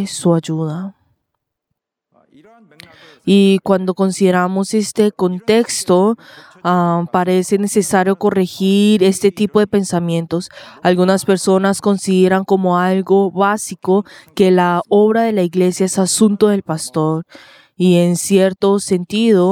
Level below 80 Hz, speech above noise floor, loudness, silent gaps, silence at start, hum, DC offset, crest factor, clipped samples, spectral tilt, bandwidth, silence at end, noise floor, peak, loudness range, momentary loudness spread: -60 dBFS; 62 dB; -15 LUFS; none; 0 s; none; under 0.1%; 14 dB; under 0.1%; -5.5 dB/octave; 16 kHz; 0 s; -76 dBFS; 0 dBFS; 3 LU; 7 LU